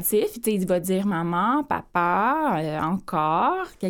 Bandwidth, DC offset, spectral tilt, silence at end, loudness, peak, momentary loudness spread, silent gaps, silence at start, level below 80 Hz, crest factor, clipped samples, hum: 18 kHz; under 0.1%; -5.5 dB/octave; 0 s; -23 LUFS; -8 dBFS; 4 LU; none; 0 s; -54 dBFS; 14 dB; under 0.1%; none